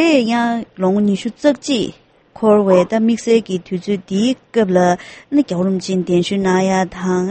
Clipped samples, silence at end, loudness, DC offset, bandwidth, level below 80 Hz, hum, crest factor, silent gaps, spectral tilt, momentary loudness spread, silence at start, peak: under 0.1%; 0 s; -16 LUFS; under 0.1%; 8.8 kHz; -54 dBFS; none; 16 dB; none; -6 dB/octave; 7 LU; 0 s; 0 dBFS